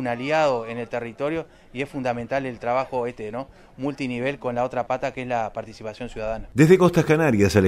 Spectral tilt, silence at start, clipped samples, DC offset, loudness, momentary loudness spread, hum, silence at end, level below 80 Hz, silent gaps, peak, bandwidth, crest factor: -6.5 dB/octave; 0 s; under 0.1%; under 0.1%; -23 LUFS; 16 LU; none; 0 s; -48 dBFS; none; -2 dBFS; 15.5 kHz; 20 dB